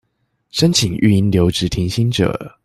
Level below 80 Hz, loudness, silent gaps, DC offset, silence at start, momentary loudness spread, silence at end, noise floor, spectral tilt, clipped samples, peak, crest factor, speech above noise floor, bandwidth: -40 dBFS; -16 LUFS; none; under 0.1%; 0.55 s; 5 LU; 0.15 s; -67 dBFS; -5.5 dB/octave; under 0.1%; -2 dBFS; 14 dB; 52 dB; 14.5 kHz